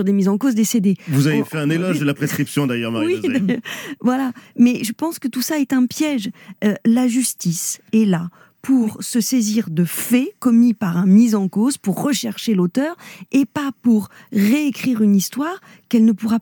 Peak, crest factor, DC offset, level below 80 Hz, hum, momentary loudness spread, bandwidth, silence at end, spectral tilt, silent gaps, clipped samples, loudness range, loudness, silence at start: -4 dBFS; 14 dB; under 0.1%; -70 dBFS; none; 7 LU; 19 kHz; 0 s; -5.5 dB/octave; none; under 0.1%; 3 LU; -18 LUFS; 0 s